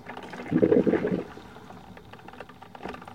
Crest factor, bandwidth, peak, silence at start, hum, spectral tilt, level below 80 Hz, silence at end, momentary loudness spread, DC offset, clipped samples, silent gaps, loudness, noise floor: 22 dB; 10.5 kHz; -6 dBFS; 0.05 s; none; -8.5 dB/octave; -58 dBFS; 0 s; 24 LU; 0.1%; under 0.1%; none; -25 LUFS; -47 dBFS